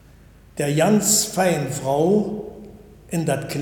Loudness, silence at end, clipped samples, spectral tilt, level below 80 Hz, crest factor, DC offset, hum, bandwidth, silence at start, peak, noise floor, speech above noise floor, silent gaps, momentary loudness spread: -20 LUFS; 0 s; under 0.1%; -4.5 dB/octave; -50 dBFS; 16 dB; under 0.1%; none; 19 kHz; 0.55 s; -4 dBFS; -48 dBFS; 28 dB; none; 14 LU